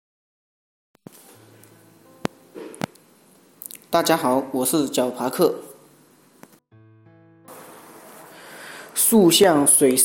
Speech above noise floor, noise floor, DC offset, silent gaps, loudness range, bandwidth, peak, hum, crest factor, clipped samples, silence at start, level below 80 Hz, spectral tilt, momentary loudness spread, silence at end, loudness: 37 dB; -54 dBFS; under 0.1%; none; 17 LU; 17 kHz; -4 dBFS; none; 20 dB; under 0.1%; 2.55 s; -64 dBFS; -3 dB/octave; 25 LU; 0 s; -19 LUFS